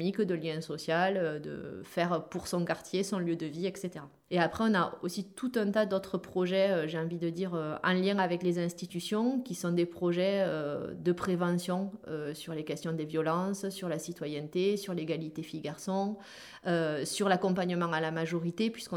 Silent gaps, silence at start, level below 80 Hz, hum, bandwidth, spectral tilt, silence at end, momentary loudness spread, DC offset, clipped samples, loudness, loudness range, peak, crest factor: none; 0 s; -70 dBFS; none; 17 kHz; -5.5 dB/octave; 0 s; 10 LU; under 0.1%; under 0.1%; -32 LUFS; 3 LU; -12 dBFS; 20 dB